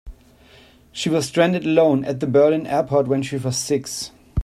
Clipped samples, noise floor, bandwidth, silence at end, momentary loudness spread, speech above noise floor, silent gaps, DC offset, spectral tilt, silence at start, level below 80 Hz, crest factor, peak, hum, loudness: under 0.1%; -50 dBFS; 15 kHz; 0 s; 11 LU; 31 dB; none; under 0.1%; -5 dB/octave; 0.05 s; -48 dBFS; 18 dB; -2 dBFS; none; -20 LUFS